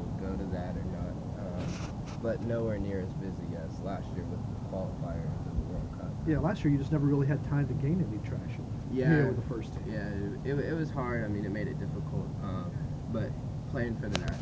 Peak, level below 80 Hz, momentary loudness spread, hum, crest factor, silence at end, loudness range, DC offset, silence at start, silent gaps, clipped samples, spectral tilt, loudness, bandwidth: -6 dBFS; -44 dBFS; 9 LU; none; 26 dB; 0 s; 5 LU; under 0.1%; 0 s; none; under 0.1%; -8 dB/octave; -33 LUFS; 8 kHz